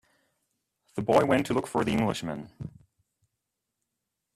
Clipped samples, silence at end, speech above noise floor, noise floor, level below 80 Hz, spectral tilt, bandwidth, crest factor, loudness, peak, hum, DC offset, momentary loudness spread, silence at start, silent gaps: under 0.1%; 1.65 s; 57 dB; -84 dBFS; -60 dBFS; -6 dB/octave; 14.5 kHz; 24 dB; -27 LUFS; -8 dBFS; none; under 0.1%; 20 LU; 0.95 s; none